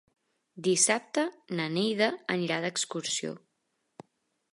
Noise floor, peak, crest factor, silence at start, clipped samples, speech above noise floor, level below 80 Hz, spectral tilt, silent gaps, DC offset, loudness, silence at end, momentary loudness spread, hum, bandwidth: -79 dBFS; -10 dBFS; 22 dB; 0.55 s; under 0.1%; 49 dB; -82 dBFS; -3 dB/octave; none; under 0.1%; -29 LUFS; 1.15 s; 9 LU; none; 11.5 kHz